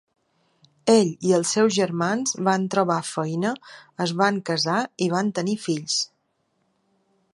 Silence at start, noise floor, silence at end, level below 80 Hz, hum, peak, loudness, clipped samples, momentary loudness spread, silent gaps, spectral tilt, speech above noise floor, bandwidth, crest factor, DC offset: 0.85 s; -71 dBFS; 1.3 s; -72 dBFS; none; -4 dBFS; -23 LUFS; under 0.1%; 9 LU; none; -4.5 dB/octave; 48 dB; 11.5 kHz; 20 dB; under 0.1%